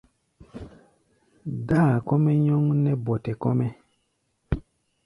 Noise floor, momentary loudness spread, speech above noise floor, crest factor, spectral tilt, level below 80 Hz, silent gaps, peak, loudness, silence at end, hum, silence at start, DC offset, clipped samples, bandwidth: -72 dBFS; 21 LU; 50 dB; 16 dB; -10.5 dB/octave; -46 dBFS; none; -8 dBFS; -24 LUFS; 0.45 s; none; 0.55 s; under 0.1%; under 0.1%; 10.5 kHz